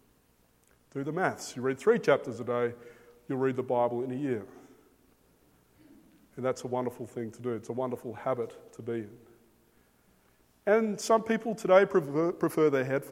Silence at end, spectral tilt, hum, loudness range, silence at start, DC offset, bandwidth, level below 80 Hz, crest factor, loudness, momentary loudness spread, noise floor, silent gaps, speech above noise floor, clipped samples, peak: 0 s; -6 dB/octave; none; 10 LU; 0.95 s; under 0.1%; 16 kHz; -72 dBFS; 24 dB; -30 LUFS; 13 LU; -67 dBFS; none; 37 dB; under 0.1%; -6 dBFS